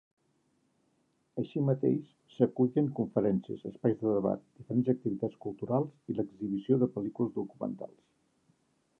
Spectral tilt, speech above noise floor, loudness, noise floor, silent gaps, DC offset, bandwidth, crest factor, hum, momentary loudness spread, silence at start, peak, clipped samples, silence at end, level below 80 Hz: -11 dB/octave; 43 dB; -32 LUFS; -74 dBFS; none; under 0.1%; 3.9 kHz; 22 dB; none; 10 LU; 1.35 s; -12 dBFS; under 0.1%; 1.15 s; -70 dBFS